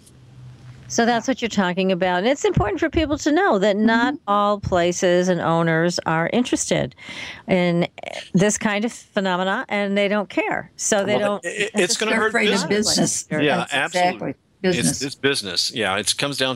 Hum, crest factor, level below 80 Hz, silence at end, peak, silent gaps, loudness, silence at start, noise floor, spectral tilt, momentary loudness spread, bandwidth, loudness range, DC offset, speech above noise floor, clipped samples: none; 18 dB; -46 dBFS; 0 s; -4 dBFS; none; -20 LUFS; 0.35 s; -44 dBFS; -4 dB/octave; 6 LU; 16 kHz; 3 LU; under 0.1%; 23 dB; under 0.1%